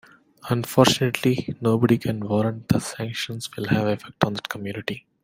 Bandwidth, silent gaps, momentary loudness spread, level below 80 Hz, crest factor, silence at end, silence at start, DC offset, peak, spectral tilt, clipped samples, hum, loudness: 16.5 kHz; none; 12 LU; -56 dBFS; 22 dB; 0.25 s; 0.45 s; under 0.1%; -2 dBFS; -5.5 dB/octave; under 0.1%; none; -23 LUFS